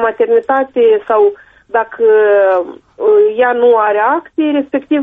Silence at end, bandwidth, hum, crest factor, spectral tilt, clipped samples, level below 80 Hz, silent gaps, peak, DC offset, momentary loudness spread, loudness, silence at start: 0 s; 3.8 kHz; none; 10 dB; -7 dB/octave; under 0.1%; -58 dBFS; none; -2 dBFS; under 0.1%; 7 LU; -12 LUFS; 0 s